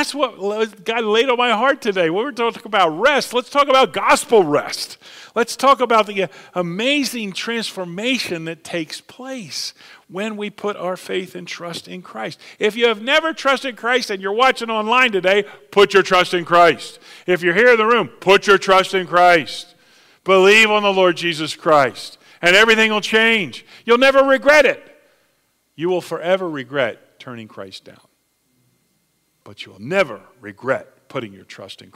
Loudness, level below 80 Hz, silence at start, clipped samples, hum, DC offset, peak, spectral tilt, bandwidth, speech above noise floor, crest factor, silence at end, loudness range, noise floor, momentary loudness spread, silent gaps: -16 LUFS; -58 dBFS; 0 s; under 0.1%; none; under 0.1%; -2 dBFS; -3.5 dB/octave; 16 kHz; 48 dB; 16 dB; 0.2 s; 13 LU; -65 dBFS; 18 LU; none